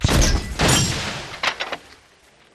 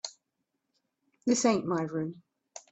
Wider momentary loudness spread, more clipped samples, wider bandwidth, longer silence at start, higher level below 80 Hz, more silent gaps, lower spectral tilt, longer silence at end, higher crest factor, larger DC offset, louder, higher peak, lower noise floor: second, 12 LU vs 21 LU; neither; first, 13 kHz vs 8.4 kHz; about the same, 0 s vs 0.05 s; first, -28 dBFS vs -74 dBFS; neither; about the same, -3.5 dB/octave vs -4.5 dB/octave; first, 0.75 s vs 0.15 s; about the same, 18 dB vs 20 dB; neither; first, -20 LUFS vs -30 LUFS; first, -4 dBFS vs -14 dBFS; second, -53 dBFS vs -83 dBFS